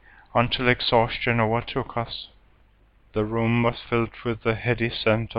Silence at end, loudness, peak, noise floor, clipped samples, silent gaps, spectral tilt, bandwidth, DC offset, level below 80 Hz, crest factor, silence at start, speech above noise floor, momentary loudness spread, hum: 0 s; -24 LUFS; -4 dBFS; -58 dBFS; under 0.1%; none; -8.5 dB/octave; 5.4 kHz; under 0.1%; -44 dBFS; 20 dB; 0.35 s; 34 dB; 9 LU; none